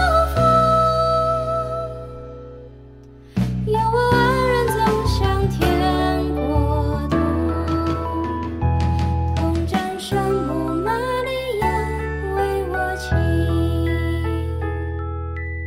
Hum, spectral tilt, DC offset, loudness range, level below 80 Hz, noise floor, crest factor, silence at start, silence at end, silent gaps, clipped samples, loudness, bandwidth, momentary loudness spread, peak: none; -7 dB/octave; under 0.1%; 3 LU; -30 dBFS; -42 dBFS; 16 dB; 0 s; 0 s; none; under 0.1%; -20 LUFS; 16 kHz; 10 LU; -4 dBFS